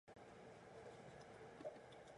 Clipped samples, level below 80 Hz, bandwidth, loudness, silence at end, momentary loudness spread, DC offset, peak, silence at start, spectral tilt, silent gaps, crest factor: under 0.1%; -80 dBFS; 11 kHz; -59 LUFS; 0 s; 5 LU; under 0.1%; -40 dBFS; 0.05 s; -5 dB/octave; none; 20 dB